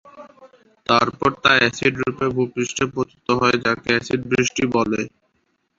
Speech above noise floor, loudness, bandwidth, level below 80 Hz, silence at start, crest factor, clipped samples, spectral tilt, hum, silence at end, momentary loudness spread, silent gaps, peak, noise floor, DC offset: 49 dB; -19 LUFS; 7.8 kHz; -50 dBFS; 0.05 s; 20 dB; under 0.1%; -4 dB/octave; none; 0.7 s; 8 LU; none; -2 dBFS; -68 dBFS; under 0.1%